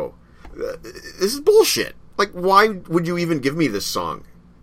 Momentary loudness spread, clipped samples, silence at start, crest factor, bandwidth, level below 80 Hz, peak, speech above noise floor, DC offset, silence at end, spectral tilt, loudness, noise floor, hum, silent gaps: 17 LU; under 0.1%; 0 s; 20 dB; 16 kHz; -48 dBFS; 0 dBFS; 22 dB; under 0.1%; 0.4 s; -4 dB/octave; -19 LUFS; -41 dBFS; none; none